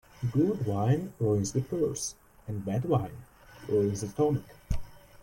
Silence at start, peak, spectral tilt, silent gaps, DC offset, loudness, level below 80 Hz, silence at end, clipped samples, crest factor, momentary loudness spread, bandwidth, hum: 0.2 s; -14 dBFS; -7 dB/octave; none; under 0.1%; -30 LUFS; -46 dBFS; 0.25 s; under 0.1%; 16 dB; 11 LU; 16.5 kHz; none